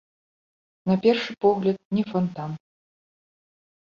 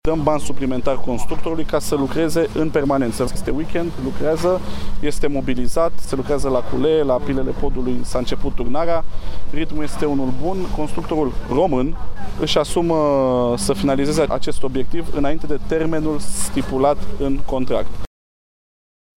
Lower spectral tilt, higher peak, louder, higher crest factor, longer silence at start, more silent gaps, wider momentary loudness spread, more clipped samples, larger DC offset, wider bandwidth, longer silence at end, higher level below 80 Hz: first, -8 dB/octave vs -5.5 dB/octave; second, -6 dBFS vs -2 dBFS; second, -24 LUFS vs -21 LUFS; first, 20 dB vs 14 dB; first, 0.85 s vs 0.05 s; first, 1.85-1.91 s vs none; first, 14 LU vs 8 LU; neither; neither; second, 7.2 kHz vs 14.5 kHz; first, 1.3 s vs 1.15 s; second, -66 dBFS vs -30 dBFS